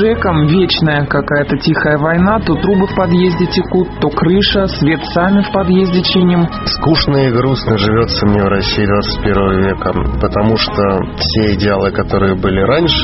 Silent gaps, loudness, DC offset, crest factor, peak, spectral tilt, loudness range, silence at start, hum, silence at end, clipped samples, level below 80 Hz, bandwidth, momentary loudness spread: none; -12 LUFS; under 0.1%; 12 dB; 0 dBFS; -4.5 dB/octave; 2 LU; 0 s; none; 0 s; under 0.1%; -26 dBFS; 6 kHz; 4 LU